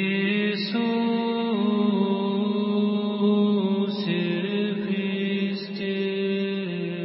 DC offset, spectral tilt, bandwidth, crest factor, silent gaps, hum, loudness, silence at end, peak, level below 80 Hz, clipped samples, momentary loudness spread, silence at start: under 0.1%; -11 dB/octave; 5.8 kHz; 12 dB; none; none; -25 LUFS; 0 s; -12 dBFS; -76 dBFS; under 0.1%; 5 LU; 0 s